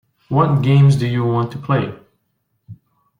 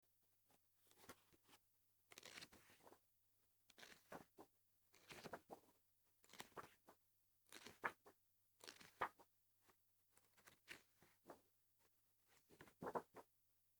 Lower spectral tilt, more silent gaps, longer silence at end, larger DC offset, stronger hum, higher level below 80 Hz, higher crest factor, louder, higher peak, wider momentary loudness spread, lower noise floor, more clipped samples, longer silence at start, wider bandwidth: first, -8.5 dB/octave vs -3 dB/octave; neither; about the same, 0.45 s vs 0.55 s; neither; second, none vs 50 Hz at -90 dBFS; first, -52 dBFS vs under -90 dBFS; second, 16 dB vs 36 dB; first, -16 LUFS vs -58 LUFS; first, -2 dBFS vs -26 dBFS; second, 9 LU vs 17 LU; second, -69 dBFS vs -83 dBFS; neither; second, 0.3 s vs 0.5 s; second, 10 kHz vs over 20 kHz